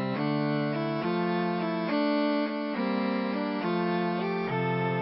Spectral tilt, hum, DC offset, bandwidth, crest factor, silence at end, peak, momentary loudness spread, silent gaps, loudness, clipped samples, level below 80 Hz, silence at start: -11 dB/octave; none; under 0.1%; 5.8 kHz; 12 dB; 0 s; -16 dBFS; 3 LU; none; -29 LUFS; under 0.1%; -74 dBFS; 0 s